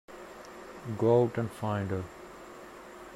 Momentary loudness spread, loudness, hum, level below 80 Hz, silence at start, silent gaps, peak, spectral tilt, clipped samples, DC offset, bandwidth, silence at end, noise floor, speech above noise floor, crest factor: 22 LU; -30 LUFS; none; -64 dBFS; 0.1 s; none; -12 dBFS; -8 dB/octave; under 0.1%; under 0.1%; 15.5 kHz; 0 s; -48 dBFS; 19 dB; 20 dB